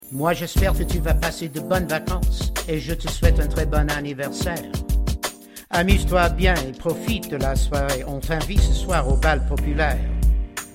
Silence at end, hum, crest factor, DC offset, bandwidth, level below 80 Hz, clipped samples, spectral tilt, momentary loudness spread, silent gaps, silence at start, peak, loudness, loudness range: 0 s; none; 18 dB; under 0.1%; 16.5 kHz; -24 dBFS; under 0.1%; -5 dB/octave; 7 LU; none; 0.05 s; -2 dBFS; -22 LUFS; 2 LU